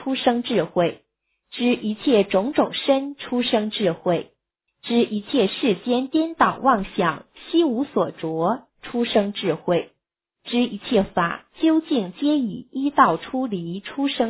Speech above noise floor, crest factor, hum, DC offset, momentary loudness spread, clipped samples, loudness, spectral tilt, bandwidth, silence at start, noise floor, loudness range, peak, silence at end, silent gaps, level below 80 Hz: 58 dB; 20 dB; none; under 0.1%; 8 LU; under 0.1%; -22 LUFS; -10 dB/octave; 4 kHz; 0 s; -79 dBFS; 2 LU; -2 dBFS; 0 s; none; -56 dBFS